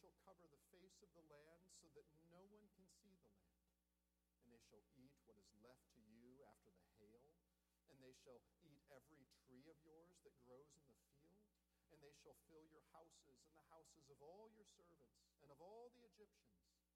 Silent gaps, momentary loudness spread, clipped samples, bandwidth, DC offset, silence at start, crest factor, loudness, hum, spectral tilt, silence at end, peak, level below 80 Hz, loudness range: none; 5 LU; under 0.1%; 13 kHz; under 0.1%; 0 s; 20 dB; -68 LUFS; none; -4.5 dB/octave; 0 s; -52 dBFS; -90 dBFS; 0 LU